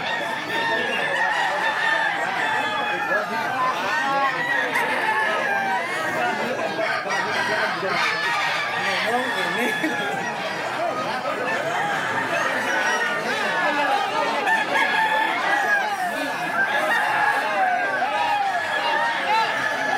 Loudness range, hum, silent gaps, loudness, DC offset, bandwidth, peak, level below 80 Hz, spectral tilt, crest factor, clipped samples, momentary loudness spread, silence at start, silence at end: 3 LU; none; none; -22 LUFS; under 0.1%; 16 kHz; -8 dBFS; -78 dBFS; -2.5 dB/octave; 14 dB; under 0.1%; 5 LU; 0 s; 0 s